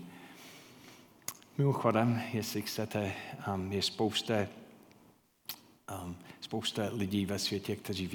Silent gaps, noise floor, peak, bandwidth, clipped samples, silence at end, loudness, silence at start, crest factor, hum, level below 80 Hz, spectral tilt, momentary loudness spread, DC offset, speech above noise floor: none; -65 dBFS; -14 dBFS; 19 kHz; under 0.1%; 0 s; -34 LUFS; 0 s; 22 dB; none; -72 dBFS; -5 dB/octave; 21 LU; under 0.1%; 31 dB